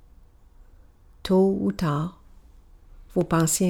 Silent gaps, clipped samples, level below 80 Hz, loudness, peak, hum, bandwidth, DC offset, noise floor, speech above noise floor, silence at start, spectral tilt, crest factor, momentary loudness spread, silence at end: none; under 0.1%; -48 dBFS; -24 LUFS; -10 dBFS; none; over 20 kHz; under 0.1%; -52 dBFS; 30 dB; 1.25 s; -5.5 dB/octave; 16 dB; 11 LU; 0 s